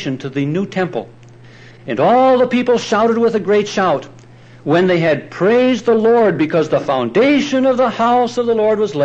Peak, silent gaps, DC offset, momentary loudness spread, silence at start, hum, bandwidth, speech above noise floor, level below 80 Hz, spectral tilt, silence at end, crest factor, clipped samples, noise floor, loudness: -4 dBFS; none; under 0.1%; 8 LU; 0 s; none; 8.2 kHz; 26 dB; -56 dBFS; -6 dB/octave; 0 s; 12 dB; under 0.1%; -40 dBFS; -14 LUFS